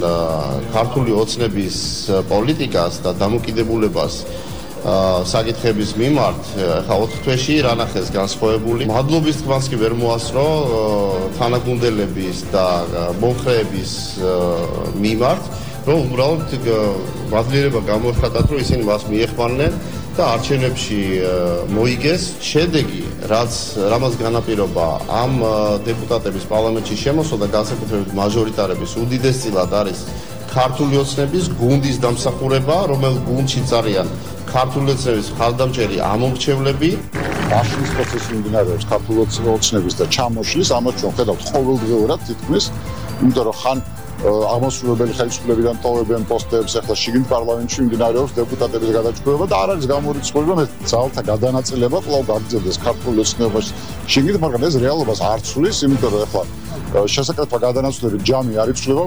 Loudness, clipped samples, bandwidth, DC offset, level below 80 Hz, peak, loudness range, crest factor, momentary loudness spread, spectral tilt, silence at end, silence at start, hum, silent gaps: -18 LUFS; under 0.1%; over 20 kHz; 2%; -34 dBFS; -4 dBFS; 1 LU; 14 dB; 5 LU; -5.5 dB/octave; 0 s; 0 s; none; none